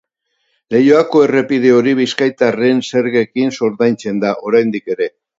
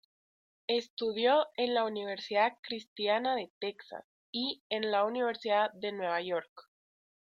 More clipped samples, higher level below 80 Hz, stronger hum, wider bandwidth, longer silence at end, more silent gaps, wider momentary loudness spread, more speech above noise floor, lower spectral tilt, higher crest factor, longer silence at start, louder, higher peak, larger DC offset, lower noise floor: neither; first, -60 dBFS vs -82 dBFS; neither; about the same, 7.8 kHz vs 7.4 kHz; second, 0.3 s vs 0.65 s; second, none vs 0.90-0.97 s, 2.59-2.63 s, 2.88-2.96 s, 3.50-3.61 s, 4.04-4.33 s, 4.60-4.70 s, 6.49-6.56 s; second, 7 LU vs 12 LU; second, 54 dB vs over 58 dB; first, -6 dB/octave vs -4.5 dB/octave; second, 14 dB vs 20 dB; about the same, 0.7 s vs 0.7 s; first, -14 LUFS vs -32 LUFS; first, 0 dBFS vs -14 dBFS; neither; second, -67 dBFS vs under -90 dBFS